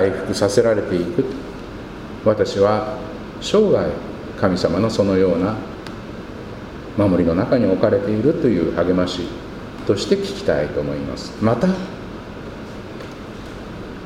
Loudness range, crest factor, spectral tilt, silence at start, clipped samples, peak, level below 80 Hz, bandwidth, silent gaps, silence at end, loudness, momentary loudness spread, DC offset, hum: 3 LU; 18 dB; -6.5 dB/octave; 0 s; under 0.1%; -2 dBFS; -42 dBFS; 14.5 kHz; none; 0 s; -19 LUFS; 16 LU; under 0.1%; none